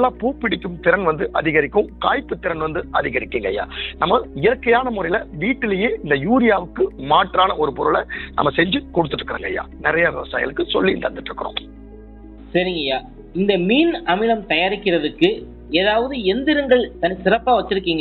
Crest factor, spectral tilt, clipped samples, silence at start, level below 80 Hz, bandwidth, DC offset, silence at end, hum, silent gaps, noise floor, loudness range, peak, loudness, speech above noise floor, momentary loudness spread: 18 dB; -8 dB/octave; under 0.1%; 0 s; -40 dBFS; 4.5 kHz; under 0.1%; 0 s; none; none; -39 dBFS; 4 LU; -2 dBFS; -19 LUFS; 20 dB; 8 LU